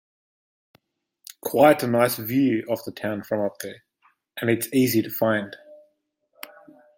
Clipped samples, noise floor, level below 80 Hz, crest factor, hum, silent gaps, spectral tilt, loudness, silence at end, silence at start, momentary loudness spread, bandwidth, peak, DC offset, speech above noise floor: under 0.1%; -71 dBFS; -66 dBFS; 22 dB; none; none; -5.5 dB/octave; -23 LUFS; 0.5 s; 1.45 s; 24 LU; 16.5 kHz; -4 dBFS; under 0.1%; 48 dB